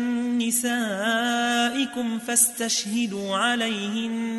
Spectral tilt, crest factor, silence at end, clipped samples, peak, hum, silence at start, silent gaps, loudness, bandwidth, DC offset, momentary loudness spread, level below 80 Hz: -2 dB/octave; 18 dB; 0 s; under 0.1%; -6 dBFS; none; 0 s; none; -23 LUFS; 12 kHz; under 0.1%; 7 LU; -70 dBFS